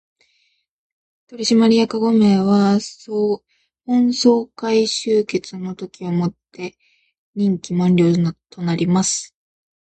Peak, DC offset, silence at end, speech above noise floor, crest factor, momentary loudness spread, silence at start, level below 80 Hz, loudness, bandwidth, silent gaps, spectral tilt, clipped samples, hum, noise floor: -2 dBFS; under 0.1%; 0.65 s; 48 dB; 16 dB; 15 LU; 1.3 s; -60 dBFS; -18 LUFS; 9.2 kHz; 7.18-7.33 s; -5.5 dB/octave; under 0.1%; none; -65 dBFS